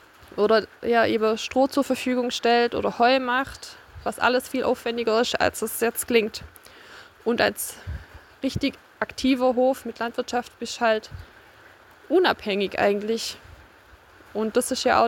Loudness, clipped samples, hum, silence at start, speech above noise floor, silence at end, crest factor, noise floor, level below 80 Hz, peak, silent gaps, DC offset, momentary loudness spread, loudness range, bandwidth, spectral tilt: -24 LUFS; under 0.1%; none; 0.35 s; 28 dB; 0 s; 20 dB; -52 dBFS; -52 dBFS; -4 dBFS; none; under 0.1%; 13 LU; 4 LU; 17 kHz; -3.5 dB/octave